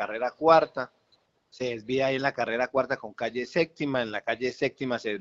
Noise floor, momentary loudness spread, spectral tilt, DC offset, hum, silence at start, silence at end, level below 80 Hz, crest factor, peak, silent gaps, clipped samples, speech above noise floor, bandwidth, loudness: -68 dBFS; 12 LU; -3 dB/octave; under 0.1%; none; 0 s; 0 s; -66 dBFS; 22 dB; -6 dBFS; none; under 0.1%; 41 dB; 7.6 kHz; -27 LUFS